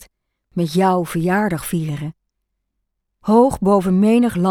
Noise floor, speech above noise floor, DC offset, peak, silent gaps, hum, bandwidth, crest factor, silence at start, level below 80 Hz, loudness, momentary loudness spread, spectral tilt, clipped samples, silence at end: -75 dBFS; 59 dB; under 0.1%; -2 dBFS; none; none; 17.5 kHz; 16 dB; 0.55 s; -46 dBFS; -17 LUFS; 14 LU; -7 dB/octave; under 0.1%; 0 s